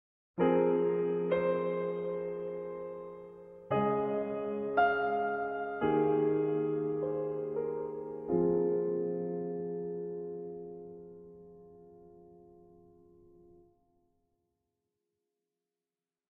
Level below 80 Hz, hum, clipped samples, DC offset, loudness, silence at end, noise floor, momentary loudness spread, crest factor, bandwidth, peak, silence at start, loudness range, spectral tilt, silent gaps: -68 dBFS; none; under 0.1%; under 0.1%; -33 LUFS; 3.95 s; under -90 dBFS; 18 LU; 18 dB; 4 kHz; -16 dBFS; 0.35 s; 13 LU; -10.5 dB/octave; none